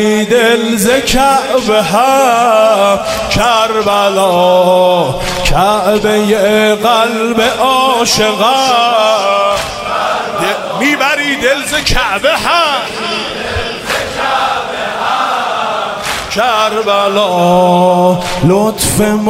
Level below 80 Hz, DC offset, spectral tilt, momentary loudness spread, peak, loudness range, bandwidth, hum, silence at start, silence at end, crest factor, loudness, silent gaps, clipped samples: -30 dBFS; under 0.1%; -3.5 dB/octave; 7 LU; 0 dBFS; 4 LU; 16.5 kHz; none; 0 s; 0 s; 10 dB; -10 LUFS; none; under 0.1%